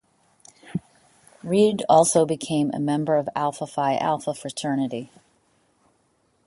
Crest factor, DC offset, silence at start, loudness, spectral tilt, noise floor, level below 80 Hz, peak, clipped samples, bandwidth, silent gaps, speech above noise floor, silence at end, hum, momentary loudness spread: 20 dB; under 0.1%; 0.65 s; -23 LUFS; -5 dB/octave; -66 dBFS; -66 dBFS; -4 dBFS; under 0.1%; 11.5 kHz; none; 44 dB; 1.4 s; none; 17 LU